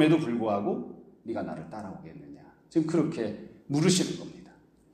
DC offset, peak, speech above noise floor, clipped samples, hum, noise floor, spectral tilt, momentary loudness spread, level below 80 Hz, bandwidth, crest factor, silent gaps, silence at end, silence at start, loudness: under 0.1%; -10 dBFS; 28 dB; under 0.1%; none; -56 dBFS; -5.5 dB/octave; 20 LU; -66 dBFS; 15 kHz; 20 dB; none; 0.5 s; 0 s; -29 LUFS